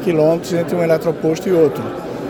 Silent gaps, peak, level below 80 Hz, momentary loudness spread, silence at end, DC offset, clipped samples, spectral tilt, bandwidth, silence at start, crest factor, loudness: none; -2 dBFS; -50 dBFS; 6 LU; 0 s; under 0.1%; under 0.1%; -7 dB/octave; 19.5 kHz; 0 s; 14 dB; -17 LUFS